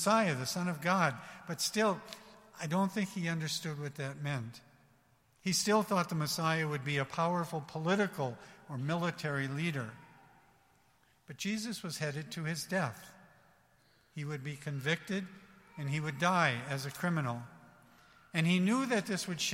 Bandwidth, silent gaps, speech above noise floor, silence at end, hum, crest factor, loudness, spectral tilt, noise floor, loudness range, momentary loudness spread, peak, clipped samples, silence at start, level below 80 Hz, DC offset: 16.5 kHz; none; 35 dB; 0 s; none; 22 dB; -34 LUFS; -4.5 dB/octave; -69 dBFS; 6 LU; 14 LU; -14 dBFS; under 0.1%; 0 s; -74 dBFS; under 0.1%